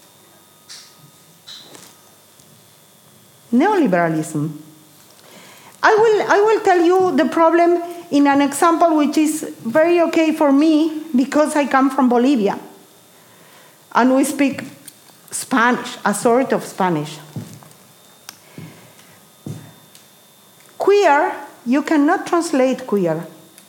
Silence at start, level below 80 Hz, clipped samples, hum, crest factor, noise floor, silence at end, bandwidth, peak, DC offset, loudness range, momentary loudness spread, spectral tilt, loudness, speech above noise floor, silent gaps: 0.7 s; -72 dBFS; under 0.1%; none; 16 dB; -49 dBFS; 0.4 s; 17 kHz; -2 dBFS; under 0.1%; 8 LU; 21 LU; -5 dB/octave; -16 LUFS; 33 dB; none